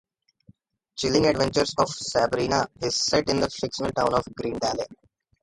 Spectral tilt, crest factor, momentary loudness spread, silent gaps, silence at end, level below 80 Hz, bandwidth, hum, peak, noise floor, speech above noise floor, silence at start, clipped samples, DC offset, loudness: -4 dB/octave; 20 dB; 8 LU; none; 0.5 s; -50 dBFS; 11.5 kHz; none; -6 dBFS; -58 dBFS; 34 dB; 0.95 s; under 0.1%; under 0.1%; -24 LUFS